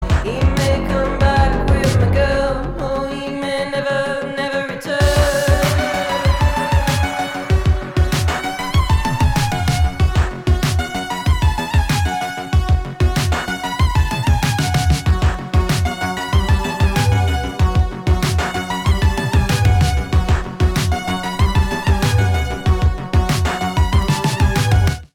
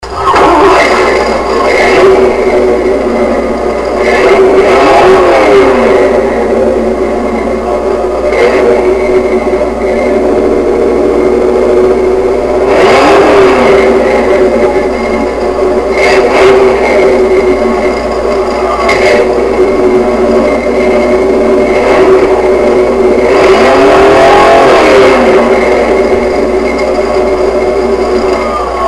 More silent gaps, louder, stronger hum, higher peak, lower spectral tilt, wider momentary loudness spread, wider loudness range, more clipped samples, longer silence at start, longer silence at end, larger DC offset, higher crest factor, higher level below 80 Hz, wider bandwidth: neither; second, -17 LUFS vs -7 LUFS; neither; about the same, -2 dBFS vs 0 dBFS; about the same, -5.5 dB/octave vs -5 dB/octave; about the same, 6 LU vs 7 LU; second, 1 LU vs 4 LU; second, under 0.1% vs 1%; about the same, 0 s vs 0 s; about the same, 0.1 s vs 0 s; second, under 0.1% vs 0.3%; first, 14 dB vs 6 dB; first, -20 dBFS vs -26 dBFS; first, 17 kHz vs 12 kHz